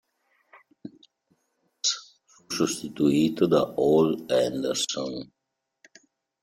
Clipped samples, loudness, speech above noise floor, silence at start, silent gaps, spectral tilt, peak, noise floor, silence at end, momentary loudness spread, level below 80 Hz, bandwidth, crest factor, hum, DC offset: under 0.1%; -25 LUFS; 49 dB; 0.85 s; none; -4.5 dB/octave; -8 dBFS; -73 dBFS; 1.2 s; 24 LU; -64 dBFS; 16.5 kHz; 18 dB; none; under 0.1%